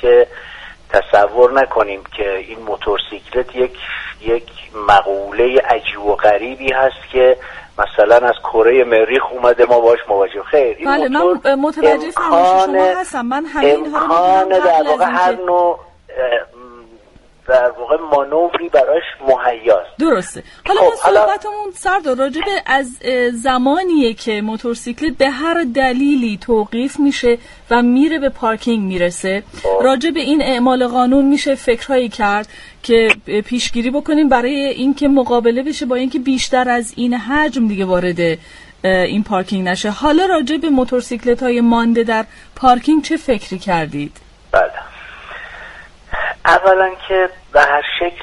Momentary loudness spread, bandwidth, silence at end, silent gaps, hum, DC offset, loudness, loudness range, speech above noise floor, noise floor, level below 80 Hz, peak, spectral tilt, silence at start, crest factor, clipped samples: 9 LU; 11.5 kHz; 0 s; none; none; under 0.1%; -14 LUFS; 4 LU; 32 dB; -46 dBFS; -40 dBFS; 0 dBFS; -4.5 dB/octave; 0 s; 14 dB; under 0.1%